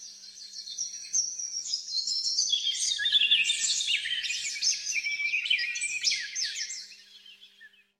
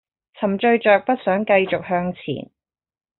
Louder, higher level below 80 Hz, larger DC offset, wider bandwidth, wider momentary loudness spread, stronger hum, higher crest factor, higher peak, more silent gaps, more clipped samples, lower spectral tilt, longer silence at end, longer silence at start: second, -26 LUFS vs -19 LUFS; second, -76 dBFS vs -60 dBFS; neither; first, 16 kHz vs 4.2 kHz; about the same, 13 LU vs 13 LU; neither; about the same, 20 dB vs 18 dB; second, -10 dBFS vs -4 dBFS; neither; neither; second, 5 dB/octave vs -4 dB/octave; second, 0.35 s vs 0.75 s; second, 0 s vs 0.4 s